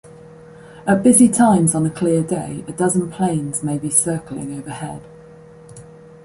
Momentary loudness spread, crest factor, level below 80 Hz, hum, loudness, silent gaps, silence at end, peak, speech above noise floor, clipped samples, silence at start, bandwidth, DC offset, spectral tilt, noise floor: 17 LU; 18 dB; -52 dBFS; none; -17 LUFS; none; 0.4 s; -2 dBFS; 25 dB; under 0.1%; 0.05 s; 11.5 kHz; under 0.1%; -5.5 dB/octave; -42 dBFS